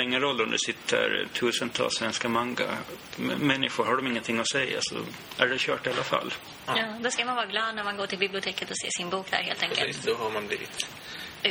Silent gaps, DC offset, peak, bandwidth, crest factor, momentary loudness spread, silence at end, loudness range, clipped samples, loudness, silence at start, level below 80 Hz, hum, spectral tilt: none; under 0.1%; -6 dBFS; over 20 kHz; 24 dB; 8 LU; 0 s; 2 LU; under 0.1%; -28 LUFS; 0 s; -66 dBFS; none; -2.5 dB/octave